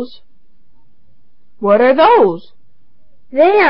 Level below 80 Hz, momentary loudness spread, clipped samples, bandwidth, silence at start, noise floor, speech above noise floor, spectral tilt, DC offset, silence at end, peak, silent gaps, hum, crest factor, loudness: -56 dBFS; 18 LU; under 0.1%; 5.6 kHz; 0 s; -58 dBFS; 47 dB; -8.5 dB/octave; 2%; 0 s; 0 dBFS; none; none; 14 dB; -11 LUFS